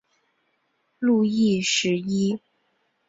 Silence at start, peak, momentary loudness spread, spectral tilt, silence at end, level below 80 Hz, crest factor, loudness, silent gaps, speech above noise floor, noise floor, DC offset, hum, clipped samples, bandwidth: 1 s; -10 dBFS; 7 LU; -4.5 dB/octave; 0.7 s; -64 dBFS; 16 dB; -23 LUFS; none; 49 dB; -71 dBFS; under 0.1%; none; under 0.1%; 8 kHz